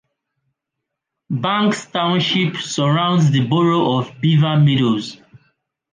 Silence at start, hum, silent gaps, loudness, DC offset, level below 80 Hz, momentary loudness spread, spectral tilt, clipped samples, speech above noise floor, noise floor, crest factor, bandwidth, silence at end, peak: 1.3 s; none; none; -17 LUFS; under 0.1%; -60 dBFS; 6 LU; -6 dB/octave; under 0.1%; 64 dB; -80 dBFS; 14 dB; 9.6 kHz; 0.8 s; -4 dBFS